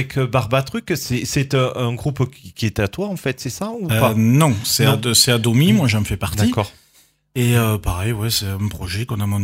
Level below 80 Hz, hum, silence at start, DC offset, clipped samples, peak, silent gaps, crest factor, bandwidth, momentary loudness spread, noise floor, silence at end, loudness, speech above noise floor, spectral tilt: -40 dBFS; none; 0 s; under 0.1%; under 0.1%; 0 dBFS; none; 18 dB; 16.5 kHz; 10 LU; -56 dBFS; 0 s; -18 LUFS; 38 dB; -5 dB/octave